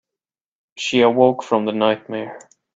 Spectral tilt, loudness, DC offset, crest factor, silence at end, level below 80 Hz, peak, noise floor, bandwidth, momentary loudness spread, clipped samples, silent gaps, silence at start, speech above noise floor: -5 dB/octave; -18 LUFS; under 0.1%; 20 dB; 0.35 s; -62 dBFS; 0 dBFS; -88 dBFS; 8 kHz; 15 LU; under 0.1%; none; 0.75 s; 70 dB